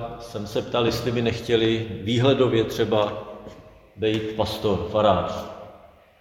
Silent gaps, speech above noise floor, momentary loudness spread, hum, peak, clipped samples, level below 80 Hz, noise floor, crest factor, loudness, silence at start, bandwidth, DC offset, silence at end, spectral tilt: none; 27 dB; 15 LU; none; -4 dBFS; under 0.1%; -48 dBFS; -50 dBFS; 18 dB; -23 LUFS; 0 s; 17 kHz; under 0.1%; 0.35 s; -6 dB/octave